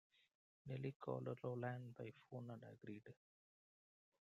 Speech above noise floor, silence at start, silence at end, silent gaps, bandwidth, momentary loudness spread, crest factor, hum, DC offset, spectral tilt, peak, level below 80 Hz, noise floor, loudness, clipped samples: over 39 dB; 0.65 s; 1.1 s; 0.95-1.00 s; 7.2 kHz; 11 LU; 20 dB; none; under 0.1%; -9 dB/octave; -32 dBFS; -86 dBFS; under -90 dBFS; -51 LUFS; under 0.1%